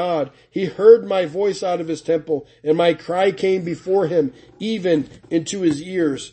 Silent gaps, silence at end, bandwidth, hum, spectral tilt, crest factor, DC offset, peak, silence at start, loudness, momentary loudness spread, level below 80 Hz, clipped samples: none; 0.05 s; 8.8 kHz; none; -5.5 dB/octave; 18 dB; under 0.1%; 0 dBFS; 0 s; -20 LUFS; 11 LU; -60 dBFS; under 0.1%